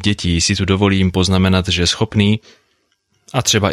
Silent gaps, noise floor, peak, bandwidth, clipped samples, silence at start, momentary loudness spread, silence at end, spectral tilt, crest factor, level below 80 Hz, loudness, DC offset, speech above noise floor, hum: none; -64 dBFS; -2 dBFS; 14 kHz; under 0.1%; 0 s; 3 LU; 0 s; -4.5 dB/octave; 14 dB; -36 dBFS; -15 LUFS; under 0.1%; 49 dB; none